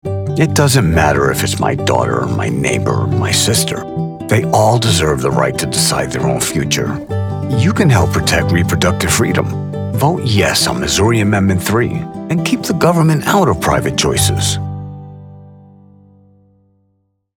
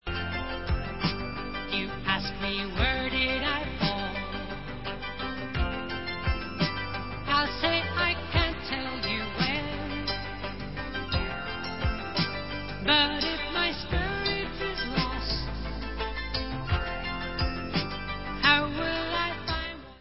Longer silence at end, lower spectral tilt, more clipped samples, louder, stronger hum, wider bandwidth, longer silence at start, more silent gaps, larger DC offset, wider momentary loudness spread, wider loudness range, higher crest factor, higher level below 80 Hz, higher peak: first, 1.85 s vs 0 s; second, -4.5 dB/octave vs -8.5 dB/octave; neither; first, -14 LUFS vs -29 LUFS; first, 50 Hz at -40 dBFS vs none; first, 18.5 kHz vs 5.8 kHz; about the same, 0.05 s vs 0 s; neither; second, under 0.1% vs 0.6%; about the same, 8 LU vs 9 LU; about the same, 2 LU vs 4 LU; second, 14 dB vs 22 dB; about the same, -34 dBFS vs -38 dBFS; first, 0 dBFS vs -8 dBFS